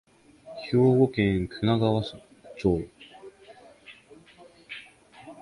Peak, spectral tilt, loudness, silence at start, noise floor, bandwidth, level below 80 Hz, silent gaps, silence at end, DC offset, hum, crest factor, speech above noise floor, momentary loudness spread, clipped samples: -8 dBFS; -8 dB/octave; -25 LUFS; 0.45 s; -53 dBFS; 11.5 kHz; -50 dBFS; none; 0.1 s; under 0.1%; none; 20 dB; 30 dB; 26 LU; under 0.1%